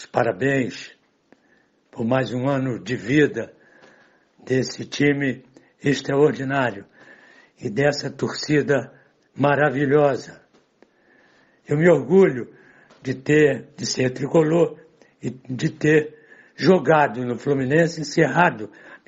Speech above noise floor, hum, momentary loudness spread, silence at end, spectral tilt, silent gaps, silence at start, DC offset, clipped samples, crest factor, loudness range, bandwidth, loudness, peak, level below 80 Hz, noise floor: 41 dB; none; 16 LU; 0.1 s; -6 dB/octave; none; 0 s; under 0.1%; under 0.1%; 20 dB; 4 LU; 8 kHz; -21 LUFS; -2 dBFS; -60 dBFS; -61 dBFS